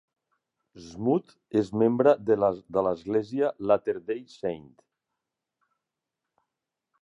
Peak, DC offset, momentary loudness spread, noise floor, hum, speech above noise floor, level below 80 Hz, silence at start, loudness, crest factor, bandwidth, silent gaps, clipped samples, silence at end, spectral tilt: -8 dBFS; under 0.1%; 12 LU; -86 dBFS; none; 60 dB; -64 dBFS; 0.75 s; -26 LUFS; 22 dB; 8 kHz; none; under 0.1%; 2.4 s; -8 dB/octave